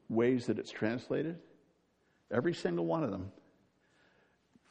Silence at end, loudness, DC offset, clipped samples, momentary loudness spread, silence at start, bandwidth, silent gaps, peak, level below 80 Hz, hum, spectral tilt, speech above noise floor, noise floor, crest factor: 1.4 s; -35 LUFS; under 0.1%; under 0.1%; 11 LU; 0.1 s; 9.2 kHz; none; -16 dBFS; -74 dBFS; none; -7 dB/octave; 40 dB; -73 dBFS; 20 dB